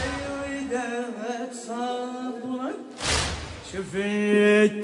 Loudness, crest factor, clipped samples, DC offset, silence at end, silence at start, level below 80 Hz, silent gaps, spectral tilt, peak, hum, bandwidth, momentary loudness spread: -26 LUFS; 18 dB; under 0.1%; under 0.1%; 0 s; 0 s; -46 dBFS; none; -4 dB/octave; -8 dBFS; none; 11 kHz; 14 LU